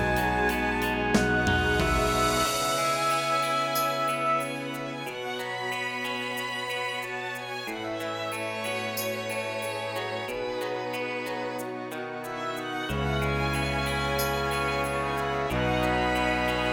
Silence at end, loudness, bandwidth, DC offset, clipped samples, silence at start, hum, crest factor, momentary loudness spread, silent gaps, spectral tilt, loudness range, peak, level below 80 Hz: 0 s; -28 LUFS; 19.5 kHz; under 0.1%; under 0.1%; 0 s; none; 18 dB; 9 LU; none; -4 dB/octave; 7 LU; -10 dBFS; -42 dBFS